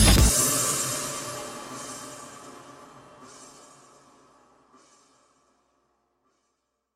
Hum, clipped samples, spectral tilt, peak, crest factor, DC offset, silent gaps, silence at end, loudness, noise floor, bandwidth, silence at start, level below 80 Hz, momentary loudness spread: none; under 0.1%; -3 dB/octave; -6 dBFS; 24 dB; under 0.1%; none; 3.5 s; -24 LUFS; -77 dBFS; 16 kHz; 0 s; -34 dBFS; 28 LU